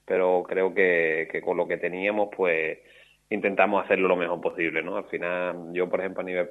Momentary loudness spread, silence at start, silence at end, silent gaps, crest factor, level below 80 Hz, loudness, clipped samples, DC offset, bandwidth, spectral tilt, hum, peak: 8 LU; 0.1 s; 0 s; none; 20 dB; -70 dBFS; -25 LUFS; under 0.1%; under 0.1%; 7.6 kHz; -7 dB/octave; none; -6 dBFS